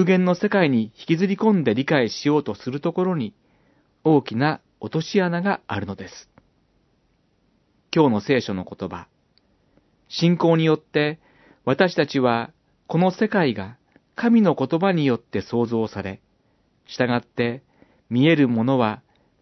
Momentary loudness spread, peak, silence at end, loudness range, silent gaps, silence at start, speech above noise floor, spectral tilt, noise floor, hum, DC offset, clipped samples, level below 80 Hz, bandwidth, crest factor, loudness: 14 LU; -2 dBFS; 0.45 s; 5 LU; none; 0 s; 44 dB; -7 dB/octave; -65 dBFS; none; under 0.1%; under 0.1%; -66 dBFS; 6.2 kHz; 20 dB; -21 LUFS